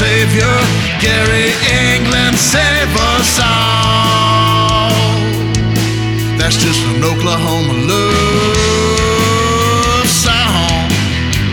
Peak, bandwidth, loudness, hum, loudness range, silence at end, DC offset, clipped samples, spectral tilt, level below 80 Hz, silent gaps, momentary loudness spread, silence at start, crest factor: 0 dBFS; 19.5 kHz; -11 LUFS; none; 2 LU; 0 s; under 0.1%; under 0.1%; -4 dB/octave; -26 dBFS; none; 4 LU; 0 s; 12 dB